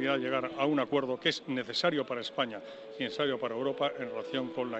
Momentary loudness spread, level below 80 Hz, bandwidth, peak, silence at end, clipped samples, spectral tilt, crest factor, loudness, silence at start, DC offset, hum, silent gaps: 7 LU; -76 dBFS; 8.2 kHz; -14 dBFS; 0 s; under 0.1%; -5 dB/octave; 18 dB; -32 LUFS; 0 s; under 0.1%; none; none